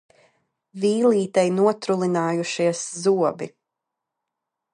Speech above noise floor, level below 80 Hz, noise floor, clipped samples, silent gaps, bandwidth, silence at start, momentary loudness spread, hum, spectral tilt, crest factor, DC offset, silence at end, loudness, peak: 62 dB; -76 dBFS; -83 dBFS; under 0.1%; none; 11 kHz; 0.75 s; 6 LU; none; -5.5 dB/octave; 18 dB; under 0.1%; 1.25 s; -21 LUFS; -6 dBFS